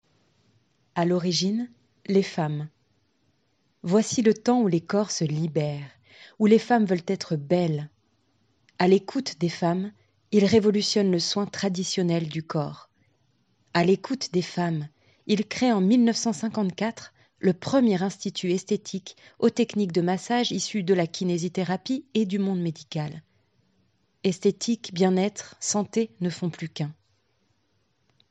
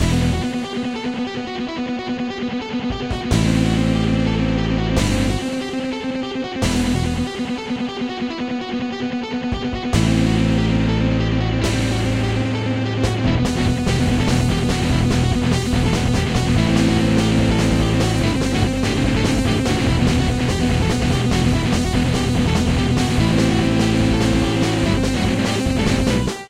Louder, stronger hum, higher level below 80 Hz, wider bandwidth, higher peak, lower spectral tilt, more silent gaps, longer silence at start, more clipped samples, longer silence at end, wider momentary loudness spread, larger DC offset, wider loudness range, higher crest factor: second, -25 LUFS vs -19 LUFS; neither; second, -70 dBFS vs -28 dBFS; second, 9.8 kHz vs 15.5 kHz; about the same, -6 dBFS vs -4 dBFS; about the same, -5.5 dB/octave vs -6 dB/octave; neither; first, 0.95 s vs 0 s; neither; first, 1.4 s vs 0 s; first, 12 LU vs 7 LU; neither; about the same, 4 LU vs 5 LU; first, 20 dB vs 14 dB